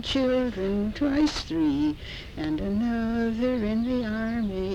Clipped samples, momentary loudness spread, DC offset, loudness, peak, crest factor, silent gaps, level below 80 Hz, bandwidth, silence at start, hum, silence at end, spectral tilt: under 0.1%; 5 LU; under 0.1%; -27 LUFS; -14 dBFS; 12 dB; none; -42 dBFS; 10.5 kHz; 0 s; none; 0 s; -6 dB/octave